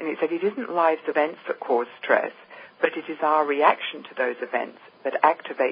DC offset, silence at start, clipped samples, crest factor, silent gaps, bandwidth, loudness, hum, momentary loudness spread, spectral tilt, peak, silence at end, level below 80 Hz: under 0.1%; 0 s; under 0.1%; 22 dB; none; 5.2 kHz; -24 LUFS; none; 11 LU; -8.5 dB/octave; -4 dBFS; 0 s; under -90 dBFS